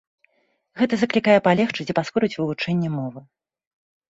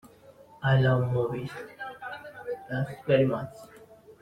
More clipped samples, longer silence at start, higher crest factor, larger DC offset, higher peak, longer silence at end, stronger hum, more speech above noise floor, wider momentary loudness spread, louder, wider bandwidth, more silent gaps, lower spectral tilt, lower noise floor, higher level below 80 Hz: neither; first, 0.75 s vs 0.05 s; about the same, 20 dB vs 20 dB; neither; first, -4 dBFS vs -10 dBFS; first, 0.9 s vs 0.1 s; neither; first, 48 dB vs 27 dB; second, 9 LU vs 17 LU; first, -21 LUFS vs -28 LUFS; second, 8 kHz vs 9.2 kHz; neither; second, -6.5 dB/octave vs -8 dB/octave; first, -68 dBFS vs -53 dBFS; about the same, -62 dBFS vs -60 dBFS